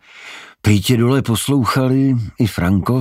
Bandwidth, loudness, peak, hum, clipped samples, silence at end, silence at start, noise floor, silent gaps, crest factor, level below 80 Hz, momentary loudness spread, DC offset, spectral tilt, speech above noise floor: 16 kHz; -16 LUFS; -2 dBFS; none; under 0.1%; 0 s; 0.15 s; -37 dBFS; none; 14 dB; -42 dBFS; 12 LU; under 0.1%; -6 dB/octave; 22 dB